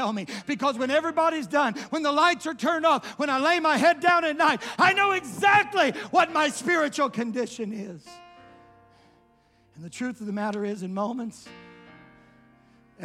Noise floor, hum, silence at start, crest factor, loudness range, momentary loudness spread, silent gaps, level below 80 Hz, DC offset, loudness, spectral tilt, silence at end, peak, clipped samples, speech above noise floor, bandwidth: -62 dBFS; none; 0 s; 18 dB; 13 LU; 13 LU; none; -70 dBFS; under 0.1%; -24 LUFS; -3.5 dB/octave; 0 s; -8 dBFS; under 0.1%; 37 dB; 15.5 kHz